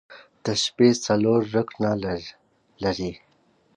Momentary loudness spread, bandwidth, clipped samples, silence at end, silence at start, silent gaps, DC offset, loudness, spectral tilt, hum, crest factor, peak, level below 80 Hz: 14 LU; 10.5 kHz; under 0.1%; 0.6 s; 0.1 s; none; under 0.1%; -24 LUFS; -5 dB/octave; none; 20 dB; -6 dBFS; -54 dBFS